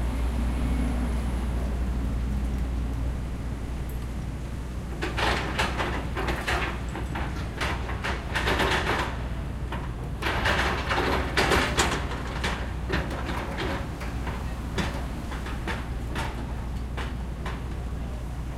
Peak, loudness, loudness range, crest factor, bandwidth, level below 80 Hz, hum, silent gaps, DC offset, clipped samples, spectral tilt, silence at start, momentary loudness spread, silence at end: -8 dBFS; -29 LUFS; 6 LU; 20 dB; 15.5 kHz; -32 dBFS; none; none; under 0.1%; under 0.1%; -5 dB/octave; 0 s; 10 LU; 0 s